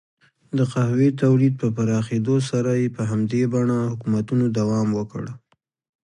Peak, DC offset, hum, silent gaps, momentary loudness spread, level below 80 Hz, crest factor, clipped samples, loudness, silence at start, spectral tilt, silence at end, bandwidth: -8 dBFS; under 0.1%; none; none; 6 LU; -58 dBFS; 14 dB; under 0.1%; -21 LUFS; 0.55 s; -8 dB/octave; 0.65 s; 10.5 kHz